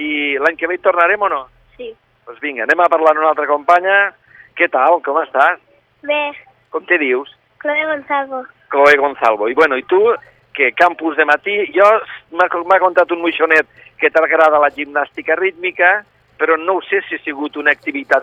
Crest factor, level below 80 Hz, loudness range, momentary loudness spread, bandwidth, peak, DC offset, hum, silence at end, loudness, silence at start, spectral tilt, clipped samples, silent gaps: 16 dB; -62 dBFS; 3 LU; 13 LU; 10.5 kHz; 0 dBFS; under 0.1%; none; 0 s; -14 LUFS; 0 s; -4 dB/octave; under 0.1%; none